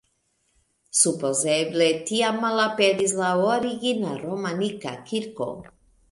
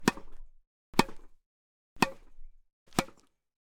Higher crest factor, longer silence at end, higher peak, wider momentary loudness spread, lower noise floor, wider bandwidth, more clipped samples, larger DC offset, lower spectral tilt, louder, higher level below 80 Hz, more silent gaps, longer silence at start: second, 20 dB vs 32 dB; second, 0.45 s vs 0.65 s; about the same, -4 dBFS vs -4 dBFS; second, 10 LU vs 13 LU; first, -70 dBFS vs -54 dBFS; second, 11.5 kHz vs 19 kHz; neither; neither; about the same, -3 dB/octave vs -4 dB/octave; first, -23 LUFS vs -32 LUFS; second, -66 dBFS vs -50 dBFS; second, none vs 0.67-0.93 s, 1.46-1.96 s, 2.73-2.86 s; first, 0.95 s vs 0 s